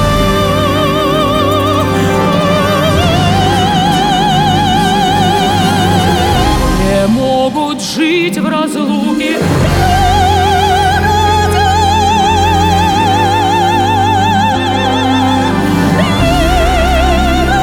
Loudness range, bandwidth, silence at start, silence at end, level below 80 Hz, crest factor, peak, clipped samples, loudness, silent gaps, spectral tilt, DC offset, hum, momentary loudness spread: 2 LU; 19.5 kHz; 0 s; 0 s; -22 dBFS; 10 dB; 0 dBFS; under 0.1%; -10 LUFS; none; -5 dB/octave; under 0.1%; none; 2 LU